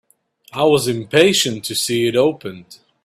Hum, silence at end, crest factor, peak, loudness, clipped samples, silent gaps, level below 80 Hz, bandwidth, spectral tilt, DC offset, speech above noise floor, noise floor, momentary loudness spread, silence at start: none; 0.3 s; 18 dB; 0 dBFS; -16 LUFS; under 0.1%; none; -56 dBFS; 16 kHz; -3.5 dB/octave; under 0.1%; 36 dB; -53 dBFS; 16 LU; 0.55 s